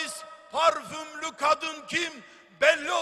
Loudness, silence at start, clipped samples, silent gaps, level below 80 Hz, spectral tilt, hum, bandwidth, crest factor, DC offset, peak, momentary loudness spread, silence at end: -26 LUFS; 0 s; under 0.1%; none; -70 dBFS; -1.5 dB/octave; none; 13.5 kHz; 22 dB; under 0.1%; -6 dBFS; 14 LU; 0 s